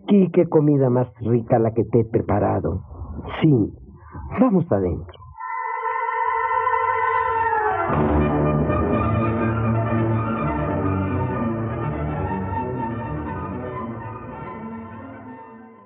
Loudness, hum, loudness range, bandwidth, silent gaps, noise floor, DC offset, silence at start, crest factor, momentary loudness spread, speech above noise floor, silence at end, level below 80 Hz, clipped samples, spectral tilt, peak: -22 LUFS; none; 7 LU; 3.9 kHz; none; -42 dBFS; under 0.1%; 0.05 s; 18 dB; 16 LU; 23 dB; 0.1 s; -40 dBFS; under 0.1%; -8 dB/octave; -4 dBFS